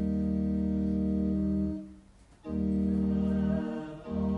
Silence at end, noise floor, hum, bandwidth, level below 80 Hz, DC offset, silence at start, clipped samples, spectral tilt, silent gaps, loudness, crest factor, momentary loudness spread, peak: 0 s; -56 dBFS; none; 4.6 kHz; -42 dBFS; under 0.1%; 0 s; under 0.1%; -10.5 dB/octave; none; -30 LUFS; 12 dB; 10 LU; -18 dBFS